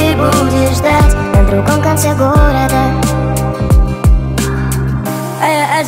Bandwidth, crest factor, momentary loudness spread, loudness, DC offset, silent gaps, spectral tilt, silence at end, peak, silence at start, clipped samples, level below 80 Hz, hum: 16.5 kHz; 10 dB; 5 LU; -12 LUFS; under 0.1%; none; -6 dB/octave; 0 s; 0 dBFS; 0 s; under 0.1%; -16 dBFS; none